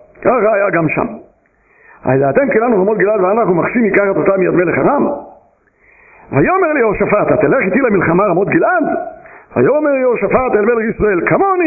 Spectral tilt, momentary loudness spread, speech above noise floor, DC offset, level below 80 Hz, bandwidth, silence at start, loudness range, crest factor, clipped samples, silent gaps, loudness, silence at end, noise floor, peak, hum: -13.5 dB/octave; 5 LU; 40 dB; under 0.1%; -42 dBFS; 2.7 kHz; 0.2 s; 2 LU; 12 dB; under 0.1%; none; -13 LUFS; 0 s; -52 dBFS; 0 dBFS; none